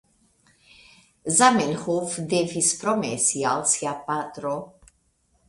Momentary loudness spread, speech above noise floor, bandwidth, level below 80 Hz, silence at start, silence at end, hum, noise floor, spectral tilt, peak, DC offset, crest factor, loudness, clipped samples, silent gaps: 12 LU; 43 dB; 11.5 kHz; -64 dBFS; 1.25 s; 0.8 s; none; -67 dBFS; -3 dB/octave; -4 dBFS; under 0.1%; 22 dB; -23 LUFS; under 0.1%; none